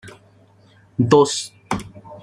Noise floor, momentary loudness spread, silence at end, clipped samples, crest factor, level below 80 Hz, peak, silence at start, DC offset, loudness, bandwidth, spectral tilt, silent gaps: -52 dBFS; 16 LU; 0 s; under 0.1%; 20 dB; -52 dBFS; -2 dBFS; 0.05 s; under 0.1%; -19 LUFS; 14.5 kHz; -5 dB/octave; none